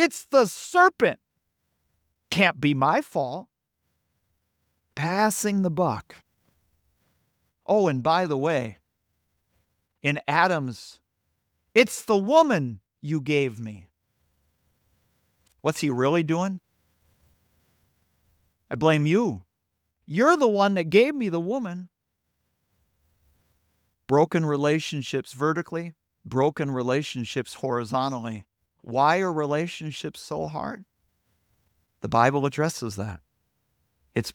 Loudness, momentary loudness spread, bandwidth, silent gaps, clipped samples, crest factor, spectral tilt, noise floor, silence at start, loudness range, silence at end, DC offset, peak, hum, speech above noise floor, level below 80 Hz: -24 LUFS; 16 LU; 19.5 kHz; none; under 0.1%; 22 dB; -5.5 dB/octave; -79 dBFS; 0 s; 6 LU; 0.05 s; under 0.1%; -4 dBFS; none; 55 dB; -64 dBFS